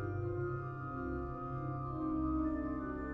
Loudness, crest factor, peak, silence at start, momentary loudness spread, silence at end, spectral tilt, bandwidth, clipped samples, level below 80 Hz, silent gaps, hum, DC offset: -39 LUFS; 12 dB; -26 dBFS; 0 s; 6 LU; 0 s; -11.5 dB/octave; 4.1 kHz; under 0.1%; -48 dBFS; none; none; under 0.1%